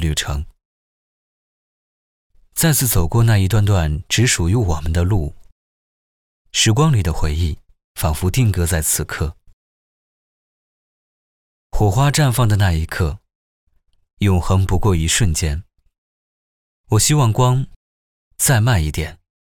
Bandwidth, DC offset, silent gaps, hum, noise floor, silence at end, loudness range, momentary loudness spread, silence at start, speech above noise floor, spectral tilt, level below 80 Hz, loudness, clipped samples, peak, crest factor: over 20 kHz; 0.4%; 0.65-2.30 s, 5.52-6.45 s, 7.84-7.95 s, 9.53-11.70 s, 13.35-13.67 s, 14.13-14.17 s, 15.98-16.84 s, 17.76-18.31 s; none; under -90 dBFS; 0.35 s; 5 LU; 12 LU; 0 s; over 74 dB; -4.5 dB/octave; -30 dBFS; -17 LUFS; under 0.1%; -4 dBFS; 14 dB